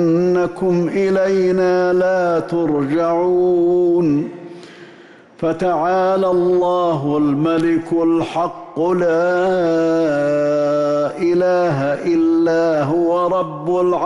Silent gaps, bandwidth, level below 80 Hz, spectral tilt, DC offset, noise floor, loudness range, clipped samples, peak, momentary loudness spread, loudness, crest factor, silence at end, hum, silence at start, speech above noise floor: none; 9.4 kHz; -54 dBFS; -7.5 dB/octave; under 0.1%; -43 dBFS; 2 LU; under 0.1%; -8 dBFS; 4 LU; -16 LUFS; 8 dB; 0 s; none; 0 s; 27 dB